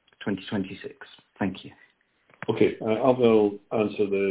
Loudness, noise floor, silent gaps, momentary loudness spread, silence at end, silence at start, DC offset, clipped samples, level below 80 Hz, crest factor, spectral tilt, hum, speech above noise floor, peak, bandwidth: -25 LUFS; -63 dBFS; none; 16 LU; 0 s; 0.2 s; under 0.1%; under 0.1%; -62 dBFS; 22 dB; -10.5 dB/octave; none; 38 dB; -4 dBFS; 4 kHz